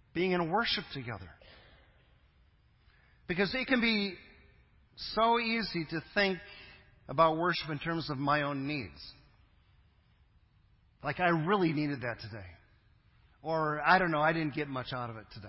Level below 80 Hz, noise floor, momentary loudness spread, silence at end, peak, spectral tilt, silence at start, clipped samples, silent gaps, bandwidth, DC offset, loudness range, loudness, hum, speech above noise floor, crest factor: -60 dBFS; -66 dBFS; 18 LU; 0 s; -10 dBFS; -9 dB/octave; 0.15 s; under 0.1%; none; 5.8 kHz; under 0.1%; 6 LU; -31 LUFS; none; 34 dB; 24 dB